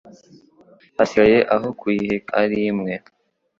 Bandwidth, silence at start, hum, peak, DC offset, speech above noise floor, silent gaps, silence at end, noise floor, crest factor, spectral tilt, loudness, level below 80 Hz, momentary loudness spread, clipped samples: 7.4 kHz; 1 s; none; -2 dBFS; under 0.1%; 34 dB; none; 0.6 s; -52 dBFS; 18 dB; -6.5 dB/octave; -19 LUFS; -54 dBFS; 13 LU; under 0.1%